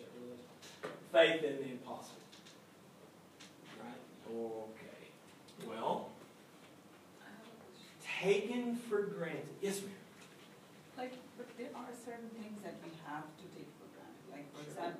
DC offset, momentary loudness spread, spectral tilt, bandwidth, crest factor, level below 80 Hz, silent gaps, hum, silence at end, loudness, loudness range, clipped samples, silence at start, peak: under 0.1%; 24 LU; -4.5 dB/octave; 15.5 kHz; 26 dB; under -90 dBFS; none; none; 0 s; -40 LUFS; 12 LU; under 0.1%; 0 s; -16 dBFS